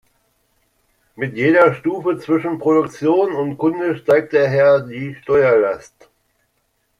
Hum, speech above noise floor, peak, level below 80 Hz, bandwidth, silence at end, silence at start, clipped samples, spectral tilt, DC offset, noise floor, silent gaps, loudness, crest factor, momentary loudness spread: none; 50 dB; -2 dBFS; -60 dBFS; 11 kHz; 1.2 s; 1.2 s; under 0.1%; -7.5 dB/octave; under 0.1%; -67 dBFS; none; -16 LUFS; 16 dB; 10 LU